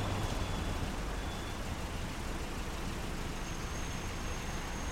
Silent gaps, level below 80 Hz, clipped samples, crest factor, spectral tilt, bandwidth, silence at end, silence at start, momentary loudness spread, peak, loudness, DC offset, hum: none; -40 dBFS; under 0.1%; 16 dB; -4.5 dB/octave; 16 kHz; 0 s; 0 s; 3 LU; -22 dBFS; -39 LUFS; under 0.1%; none